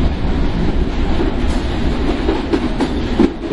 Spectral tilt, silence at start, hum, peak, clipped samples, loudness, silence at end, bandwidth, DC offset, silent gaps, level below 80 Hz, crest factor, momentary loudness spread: -7 dB/octave; 0 s; none; 0 dBFS; under 0.1%; -18 LUFS; 0 s; 11 kHz; under 0.1%; none; -20 dBFS; 16 dB; 3 LU